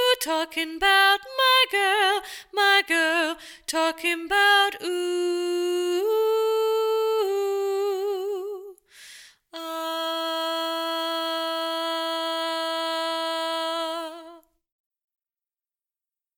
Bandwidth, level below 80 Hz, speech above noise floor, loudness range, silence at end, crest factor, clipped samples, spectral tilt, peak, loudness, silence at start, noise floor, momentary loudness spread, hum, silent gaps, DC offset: 19 kHz; -64 dBFS; over 67 dB; 9 LU; 2 s; 18 dB; under 0.1%; 0 dB/octave; -8 dBFS; -23 LUFS; 0 s; under -90 dBFS; 12 LU; none; none; under 0.1%